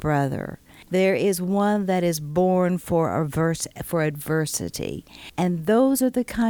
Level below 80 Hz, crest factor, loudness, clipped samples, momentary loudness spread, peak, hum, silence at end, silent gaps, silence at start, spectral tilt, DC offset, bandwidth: -50 dBFS; 14 dB; -23 LUFS; under 0.1%; 10 LU; -10 dBFS; none; 0 s; none; 0 s; -6 dB/octave; under 0.1%; 19.5 kHz